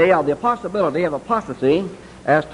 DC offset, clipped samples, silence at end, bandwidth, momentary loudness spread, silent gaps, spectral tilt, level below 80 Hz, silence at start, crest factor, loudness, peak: under 0.1%; under 0.1%; 0 s; 11 kHz; 5 LU; none; -7 dB/octave; -50 dBFS; 0 s; 18 dB; -20 LUFS; 0 dBFS